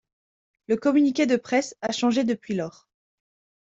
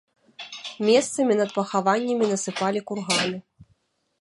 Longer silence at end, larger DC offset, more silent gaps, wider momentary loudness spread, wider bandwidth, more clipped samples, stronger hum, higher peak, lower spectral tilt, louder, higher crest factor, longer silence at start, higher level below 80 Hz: first, 0.9 s vs 0.55 s; neither; neither; second, 9 LU vs 15 LU; second, 7.8 kHz vs 11.5 kHz; neither; neither; about the same, -8 dBFS vs -6 dBFS; about the same, -4.5 dB/octave vs -3.5 dB/octave; about the same, -24 LUFS vs -23 LUFS; about the same, 16 dB vs 18 dB; first, 0.7 s vs 0.4 s; about the same, -68 dBFS vs -68 dBFS